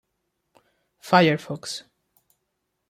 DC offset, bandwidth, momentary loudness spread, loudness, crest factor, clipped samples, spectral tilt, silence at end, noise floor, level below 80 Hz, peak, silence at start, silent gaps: under 0.1%; 15.5 kHz; 18 LU; -22 LUFS; 22 dB; under 0.1%; -5.5 dB/octave; 1.1 s; -78 dBFS; -70 dBFS; -4 dBFS; 1.05 s; none